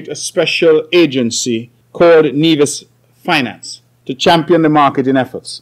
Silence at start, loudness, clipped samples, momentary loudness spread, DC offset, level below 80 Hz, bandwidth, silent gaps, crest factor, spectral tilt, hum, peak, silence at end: 0 s; -12 LUFS; under 0.1%; 16 LU; under 0.1%; -58 dBFS; 15 kHz; none; 10 dB; -4.5 dB/octave; none; -2 dBFS; 0.05 s